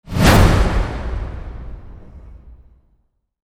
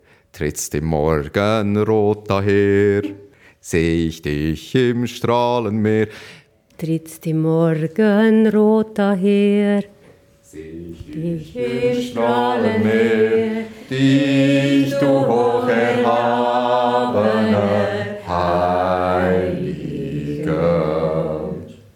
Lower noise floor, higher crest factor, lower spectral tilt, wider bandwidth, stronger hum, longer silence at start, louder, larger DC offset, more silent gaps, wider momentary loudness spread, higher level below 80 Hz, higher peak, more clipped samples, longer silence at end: first, -63 dBFS vs -49 dBFS; about the same, 18 dB vs 16 dB; about the same, -5.5 dB/octave vs -6.5 dB/octave; about the same, 18 kHz vs 17.5 kHz; neither; second, 0.1 s vs 0.35 s; about the same, -16 LUFS vs -18 LUFS; neither; neither; first, 24 LU vs 10 LU; first, -22 dBFS vs -46 dBFS; about the same, 0 dBFS vs -2 dBFS; neither; first, 0.95 s vs 0.2 s